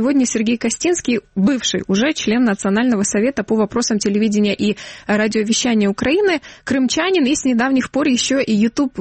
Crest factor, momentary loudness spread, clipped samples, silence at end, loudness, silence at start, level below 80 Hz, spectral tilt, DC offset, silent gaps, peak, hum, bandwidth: 10 dB; 3 LU; under 0.1%; 0 s; -17 LUFS; 0 s; -50 dBFS; -4 dB/octave; under 0.1%; none; -6 dBFS; none; 8.8 kHz